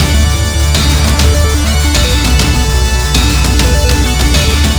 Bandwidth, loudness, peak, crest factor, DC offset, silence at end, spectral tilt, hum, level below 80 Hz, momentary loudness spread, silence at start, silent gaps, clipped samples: over 20 kHz; -10 LUFS; 0 dBFS; 8 dB; under 0.1%; 0 s; -4 dB/octave; none; -12 dBFS; 2 LU; 0 s; none; under 0.1%